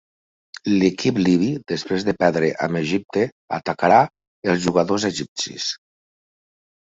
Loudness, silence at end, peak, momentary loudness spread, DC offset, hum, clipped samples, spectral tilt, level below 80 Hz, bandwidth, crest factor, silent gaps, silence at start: -21 LUFS; 1.15 s; -2 dBFS; 10 LU; under 0.1%; none; under 0.1%; -5 dB/octave; -58 dBFS; 8 kHz; 20 dB; 3.32-3.48 s, 4.27-4.42 s, 5.28-5.36 s; 0.65 s